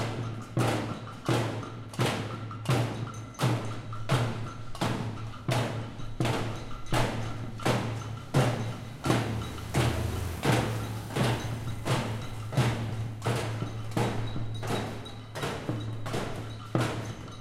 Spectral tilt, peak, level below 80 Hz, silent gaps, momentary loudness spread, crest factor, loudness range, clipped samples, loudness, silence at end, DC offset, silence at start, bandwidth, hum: -5.5 dB/octave; -10 dBFS; -46 dBFS; none; 9 LU; 20 dB; 3 LU; under 0.1%; -32 LUFS; 0 s; under 0.1%; 0 s; 15.5 kHz; none